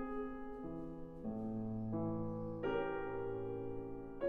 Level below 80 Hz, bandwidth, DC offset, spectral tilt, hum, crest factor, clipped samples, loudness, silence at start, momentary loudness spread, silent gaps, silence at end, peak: -56 dBFS; 4.2 kHz; under 0.1%; -10 dB/octave; none; 16 dB; under 0.1%; -43 LUFS; 0 s; 8 LU; none; 0 s; -26 dBFS